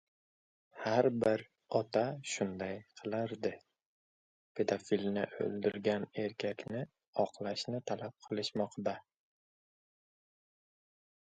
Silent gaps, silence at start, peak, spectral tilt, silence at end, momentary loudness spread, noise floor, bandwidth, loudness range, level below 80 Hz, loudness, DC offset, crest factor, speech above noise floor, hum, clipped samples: 3.86-4.55 s, 7.07-7.13 s; 0.75 s; -14 dBFS; -5.5 dB/octave; 2.35 s; 9 LU; under -90 dBFS; 9 kHz; 6 LU; -74 dBFS; -37 LUFS; under 0.1%; 24 dB; over 54 dB; none; under 0.1%